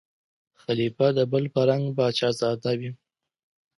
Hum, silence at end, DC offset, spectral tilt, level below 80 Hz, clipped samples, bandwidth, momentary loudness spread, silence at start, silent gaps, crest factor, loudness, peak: none; 0.85 s; under 0.1%; -6.5 dB/octave; -68 dBFS; under 0.1%; 11.5 kHz; 8 LU; 0.7 s; none; 18 dB; -24 LUFS; -8 dBFS